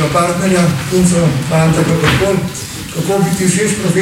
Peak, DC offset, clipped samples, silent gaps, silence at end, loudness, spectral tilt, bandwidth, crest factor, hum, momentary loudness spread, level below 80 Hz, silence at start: 0 dBFS; under 0.1%; under 0.1%; none; 0 s; -13 LUFS; -5 dB/octave; 16.5 kHz; 12 dB; none; 7 LU; -34 dBFS; 0 s